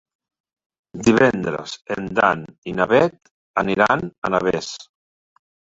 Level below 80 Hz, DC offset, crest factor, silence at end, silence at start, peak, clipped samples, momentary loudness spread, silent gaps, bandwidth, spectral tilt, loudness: -52 dBFS; under 0.1%; 20 dB; 0.95 s; 0.95 s; -2 dBFS; under 0.1%; 13 LU; 2.58-2.62 s, 3.31-3.54 s, 4.18-4.22 s; 8 kHz; -5.5 dB/octave; -20 LUFS